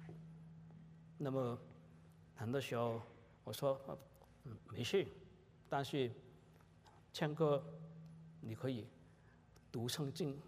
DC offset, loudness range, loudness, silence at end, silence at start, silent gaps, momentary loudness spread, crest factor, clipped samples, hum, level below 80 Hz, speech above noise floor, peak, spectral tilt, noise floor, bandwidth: under 0.1%; 3 LU; -43 LUFS; 0 s; 0 s; none; 22 LU; 22 dB; under 0.1%; none; -76 dBFS; 24 dB; -24 dBFS; -6 dB/octave; -66 dBFS; 15.5 kHz